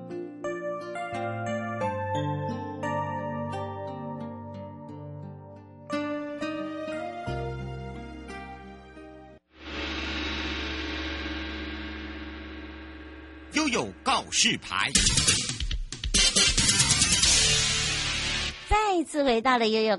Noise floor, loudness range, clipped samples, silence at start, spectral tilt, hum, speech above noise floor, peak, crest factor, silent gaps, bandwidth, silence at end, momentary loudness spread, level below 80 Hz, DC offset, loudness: -50 dBFS; 15 LU; under 0.1%; 0 s; -2 dB/octave; none; 25 dB; -6 dBFS; 24 dB; none; 11.5 kHz; 0 s; 21 LU; -40 dBFS; under 0.1%; -26 LUFS